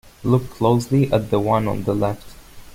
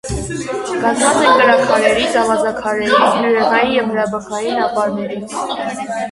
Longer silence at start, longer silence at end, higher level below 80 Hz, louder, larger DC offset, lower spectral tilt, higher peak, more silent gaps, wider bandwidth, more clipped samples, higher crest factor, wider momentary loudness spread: about the same, 0.05 s vs 0.05 s; about the same, 0.1 s vs 0 s; about the same, -42 dBFS vs -40 dBFS; second, -20 LUFS vs -15 LUFS; neither; first, -8 dB/octave vs -3.5 dB/octave; second, -4 dBFS vs 0 dBFS; neither; first, 16.5 kHz vs 11.5 kHz; neither; about the same, 16 dB vs 16 dB; second, 5 LU vs 12 LU